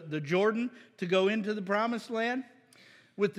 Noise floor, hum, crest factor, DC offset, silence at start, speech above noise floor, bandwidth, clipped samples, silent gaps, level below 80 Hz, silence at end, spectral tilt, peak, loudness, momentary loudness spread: -59 dBFS; none; 16 dB; under 0.1%; 0 s; 29 dB; 12 kHz; under 0.1%; none; under -90 dBFS; 0 s; -6 dB/octave; -14 dBFS; -31 LUFS; 12 LU